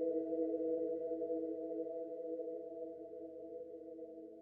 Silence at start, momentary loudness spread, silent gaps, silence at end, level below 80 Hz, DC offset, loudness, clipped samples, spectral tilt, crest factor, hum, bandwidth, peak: 0 s; 12 LU; none; 0 s; -82 dBFS; under 0.1%; -43 LUFS; under 0.1%; -9.5 dB/octave; 14 dB; none; 2.1 kHz; -28 dBFS